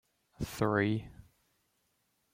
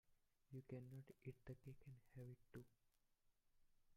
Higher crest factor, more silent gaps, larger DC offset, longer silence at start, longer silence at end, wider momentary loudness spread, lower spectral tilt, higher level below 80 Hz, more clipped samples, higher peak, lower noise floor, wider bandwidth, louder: about the same, 22 dB vs 18 dB; neither; neither; first, 0.4 s vs 0.05 s; first, 1.2 s vs 0 s; first, 14 LU vs 7 LU; second, -6.5 dB/octave vs -8.5 dB/octave; first, -58 dBFS vs -80 dBFS; neither; first, -14 dBFS vs -44 dBFS; second, -77 dBFS vs -83 dBFS; about the same, 16 kHz vs 16 kHz; first, -33 LUFS vs -61 LUFS